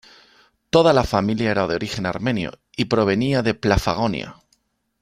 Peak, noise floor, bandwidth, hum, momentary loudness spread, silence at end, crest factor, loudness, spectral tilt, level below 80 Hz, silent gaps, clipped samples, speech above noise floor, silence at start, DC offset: -2 dBFS; -66 dBFS; 15.5 kHz; none; 10 LU; 0.7 s; 18 dB; -20 LUFS; -6 dB/octave; -40 dBFS; none; under 0.1%; 47 dB; 0.75 s; under 0.1%